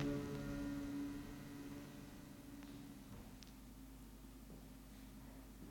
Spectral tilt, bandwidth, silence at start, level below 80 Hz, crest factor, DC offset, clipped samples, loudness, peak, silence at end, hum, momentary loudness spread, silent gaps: -6 dB/octave; 17.5 kHz; 0 s; -60 dBFS; 20 dB; under 0.1%; under 0.1%; -52 LUFS; -30 dBFS; 0 s; 50 Hz at -65 dBFS; 13 LU; none